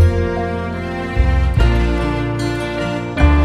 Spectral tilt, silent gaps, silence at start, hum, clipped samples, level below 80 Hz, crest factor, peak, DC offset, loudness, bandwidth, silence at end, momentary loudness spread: -7.5 dB/octave; none; 0 s; none; under 0.1%; -18 dBFS; 16 dB; 0 dBFS; under 0.1%; -18 LUFS; 10.5 kHz; 0 s; 7 LU